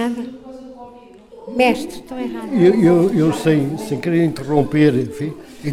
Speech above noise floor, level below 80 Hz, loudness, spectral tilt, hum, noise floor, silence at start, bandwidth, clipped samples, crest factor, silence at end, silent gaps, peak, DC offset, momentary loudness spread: 25 dB; -48 dBFS; -17 LUFS; -7 dB/octave; none; -42 dBFS; 0 s; 15 kHz; under 0.1%; 16 dB; 0 s; none; -2 dBFS; under 0.1%; 19 LU